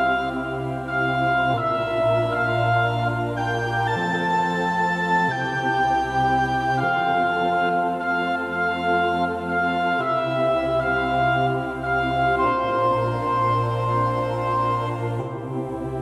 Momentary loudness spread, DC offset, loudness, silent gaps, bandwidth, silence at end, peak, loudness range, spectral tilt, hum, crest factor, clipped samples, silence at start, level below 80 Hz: 4 LU; under 0.1%; -22 LUFS; none; 12.5 kHz; 0 s; -10 dBFS; 1 LU; -6.5 dB/octave; none; 12 dB; under 0.1%; 0 s; -46 dBFS